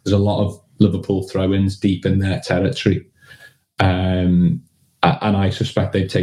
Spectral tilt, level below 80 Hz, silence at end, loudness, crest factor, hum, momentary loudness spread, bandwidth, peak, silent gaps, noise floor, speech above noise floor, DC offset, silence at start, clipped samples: -7.5 dB/octave; -46 dBFS; 0 s; -19 LUFS; 18 dB; none; 5 LU; 11 kHz; 0 dBFS; none; -46 dBFS; 29 dB; 0.2%; 0.05 s; under 0.1%